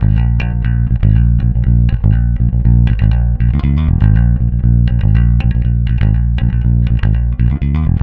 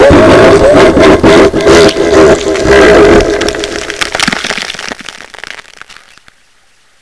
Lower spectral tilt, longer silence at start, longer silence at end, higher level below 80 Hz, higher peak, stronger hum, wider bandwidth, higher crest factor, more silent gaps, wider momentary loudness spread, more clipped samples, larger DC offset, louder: first, -10.5 dB/octave vs -4.5 dB/octave; about the same, 0 s vs 0 s; second, 0 s vs 1.4 s; first, -14 dBFS vs -24 dBFS; about the same, 0 dBFS vs 0 dBFS; neither; second, 4.1 kHz vs 11 kHz; about the same, 10 dB vs 6 dB; neither; second, 3 LU vs 21 LU; second, under 0.1% vs 8%; second, under 0.1% vs 1%; second, -13 LUFS vs -5 LUFS